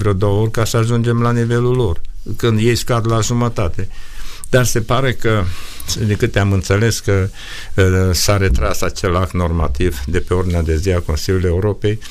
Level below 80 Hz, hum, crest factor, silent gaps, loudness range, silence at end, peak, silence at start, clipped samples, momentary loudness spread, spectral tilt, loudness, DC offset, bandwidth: -26 dBFS; none; 14 dB; none; 2 LU; 0 s; -2 dBFS; 0 s; under 0.1%; 9 LU; -5.5 dB/octave; -16 LUFS; under 0.1%; 15.5 kHz